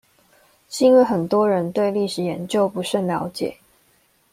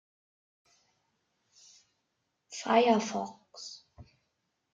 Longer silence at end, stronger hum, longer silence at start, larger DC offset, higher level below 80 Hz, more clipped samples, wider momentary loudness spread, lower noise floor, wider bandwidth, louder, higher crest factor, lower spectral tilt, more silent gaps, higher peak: about the same, 0.8 s vs 0.7 s; neither; second, 0.7 s vs 2.5 s; neither; first, -62 dBFS vs -74 dBFS; neither; second, 12 LU vs 21 LU; second, -61 dBFS vs -81 dBFS; first, 16 kHz vs 9.2 kHz; first, -20 LUFS vs -29 LUFS; second, 16 dB vs 24 dB; first, -6 dB/octave vs -4 dB/octave; neither; first, -4 dBFS vs -12 dBFS